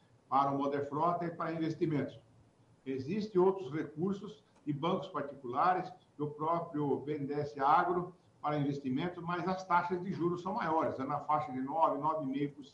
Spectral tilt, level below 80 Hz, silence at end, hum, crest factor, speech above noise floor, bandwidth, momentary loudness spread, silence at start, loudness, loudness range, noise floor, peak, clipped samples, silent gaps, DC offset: -8 dB/octave; -74 dBFS; 0.05 s; none; 22 dB; 31 dB; 7.8 kHz; 11 LU; 0.3 s; -35 LUFS; 2 LU; -65 dBFS; -14 dBFS; under 0.1%; none; under 0.1%